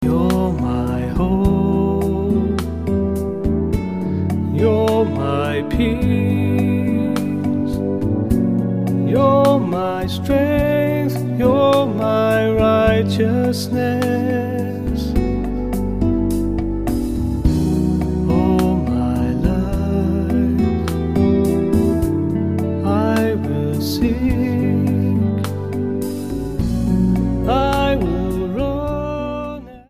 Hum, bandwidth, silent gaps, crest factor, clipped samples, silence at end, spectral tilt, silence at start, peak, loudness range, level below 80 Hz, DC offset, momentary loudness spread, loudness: none; 15.5 kHz; none; 16 dB; under 0.1%; 0 s; -7.5 dB/octave; 0 s; 0 dBFS; 3 LU; -28 dBFS; 0.7%; 6 LU; -18 LUFS